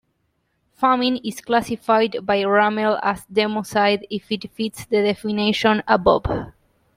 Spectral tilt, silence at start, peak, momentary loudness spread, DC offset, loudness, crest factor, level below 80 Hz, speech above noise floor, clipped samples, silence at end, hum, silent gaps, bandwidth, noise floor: -5 dB/octave; 0.8 s; -2 dBFS; 10 LU; under 0.1%; -20 LUFS; 18 dB; -46 dBFS; 50 dB; under 0.1%; 0.45 s; none; none; 16 kHz; -69 dBFS